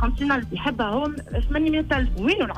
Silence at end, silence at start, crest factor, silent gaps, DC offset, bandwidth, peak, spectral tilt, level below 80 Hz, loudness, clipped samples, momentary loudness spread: 0 s; 0 s; 12 dB; none; under 0.1%; 9 kHz; -10 dBFS; -6.5 dB/octave; -28 dBFS; -24 LUFS; under 0.1%; 5 LU